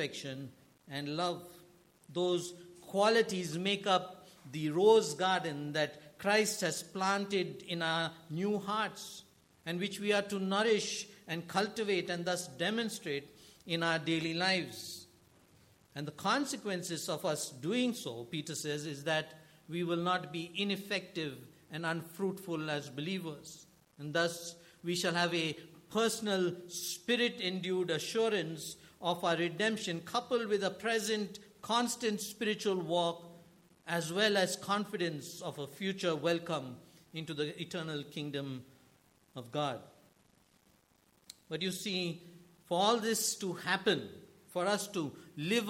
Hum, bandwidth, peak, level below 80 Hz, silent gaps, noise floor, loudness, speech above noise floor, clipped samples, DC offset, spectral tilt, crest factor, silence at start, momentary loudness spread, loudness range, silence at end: none; 16.5 kHz; -14 dBFS; -78 dBFS; none; -69 dBFS; -35 LUFS; 35 dB; under 0.1%; under 0.1%; -3.5 dB/octave; 22 dB; 0 s; 14 LU; 7 LU; 0 s